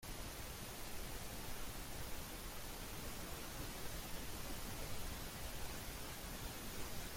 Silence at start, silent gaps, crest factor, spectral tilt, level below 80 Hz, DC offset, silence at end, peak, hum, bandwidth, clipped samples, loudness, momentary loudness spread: 0 s; none; 14 dB; -3 dB/octave; -52 dBFS; under 0.1%; 0 s; -32 dBFS; none; 16.5 kHz; under 0.1%; -48 LUFS; 1 LU